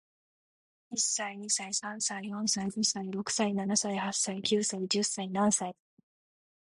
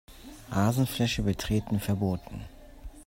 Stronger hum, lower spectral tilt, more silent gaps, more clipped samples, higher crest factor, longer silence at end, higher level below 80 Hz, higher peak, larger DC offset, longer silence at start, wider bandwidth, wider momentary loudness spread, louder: neither; second, -2.5 dB/octave vs -6 dB/octave; neither; neither; about the same, 20 dB vs 18 dB; first, 0.95 s vs 0.05 s; second, -74 dBFS vs -44 dBFS; about the same, -14 dBFS vs -12 dBFS; neither; first, 0.9 s vs 0.1 s; second, 11.5 kHz vs 16.5 kHz; second, 5 LU vs 22 LU; about the same, -30 LUFS vs -29 LUFS